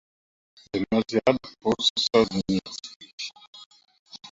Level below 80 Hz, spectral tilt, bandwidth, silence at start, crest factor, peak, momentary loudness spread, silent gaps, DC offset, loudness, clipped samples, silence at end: -56 dBFS; -4.5 dB/octave; 8 kHz; 0.75 s; 22 dB; -6 dBFS; 16 LU; 1.90-1.96 s, 2.96-3.00 s, 3.13-3.18 s, 3.47-3.53 s, 3.66-3.71 s, 3.99-4.06 s; under 0.1%; -25 LUFS; under 0.1%; 0.05 s